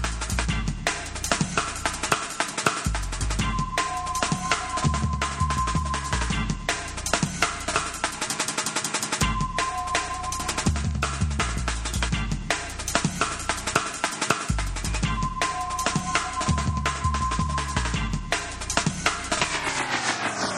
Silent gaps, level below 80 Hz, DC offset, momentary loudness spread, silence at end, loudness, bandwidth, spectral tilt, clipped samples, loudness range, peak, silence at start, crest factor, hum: none; -34 dBFS; under 0.1%; 3 LU; 0 s; -26 LUFS; 15 kHz; -3 dB/octave; under 0.1%; 1 LU; -4 dBFS; 0 s; 22 dB; none